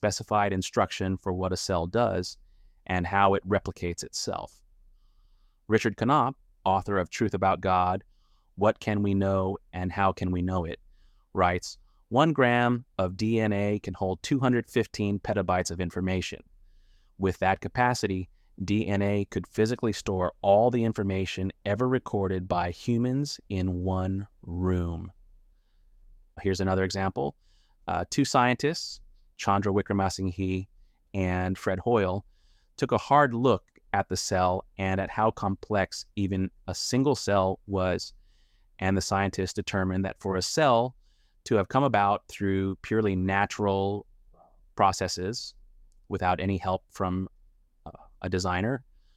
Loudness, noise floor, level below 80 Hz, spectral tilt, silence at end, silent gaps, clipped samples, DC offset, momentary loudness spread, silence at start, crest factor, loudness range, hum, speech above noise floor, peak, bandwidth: -28 LUFS; -61 dBFS; -52 dBFS; -5.5 dB/octave; 0.35 s; none; under 0.1%; under 0.1%; 10 LU; 0 s; 20 dB; 4 LU; none; 34 dB; -8 dBFS; 14.5 kHz